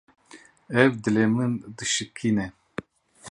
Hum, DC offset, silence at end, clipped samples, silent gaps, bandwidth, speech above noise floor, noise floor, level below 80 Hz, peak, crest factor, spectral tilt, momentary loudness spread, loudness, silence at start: none; under 0.1%; 0 s; under 0.1%; none; 11 kHz; 28 dB; -52 dBFS; -58 dBFS; -2 dBFS; 24 dB; -4.5 dB/octave; 17 LU; -24 LUFS; 0.35 s